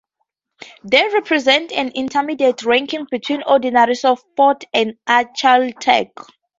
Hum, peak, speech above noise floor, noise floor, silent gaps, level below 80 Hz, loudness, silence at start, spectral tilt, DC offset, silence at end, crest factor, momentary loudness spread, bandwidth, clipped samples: none; 0 dBFS; 57 dB; -73 dBFS; none; -64 dBFS; -16 LUFS; 0.85 s; -3 dB/octave; under 0.1%; 0.55 s; 16 dB; 7 LU; 7.8 kHz; under 0.1%